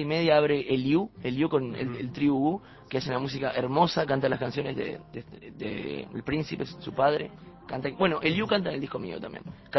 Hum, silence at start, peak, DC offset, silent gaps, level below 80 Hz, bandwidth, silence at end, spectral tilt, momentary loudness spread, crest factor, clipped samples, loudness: none; 0 s; -8 dBFS; under 0.1%; none; -58 dBFS; 6.2 kHz; 0 s; -7 dB/octave; 14 LU; 20 dB; under 0.1%; -28 LUFS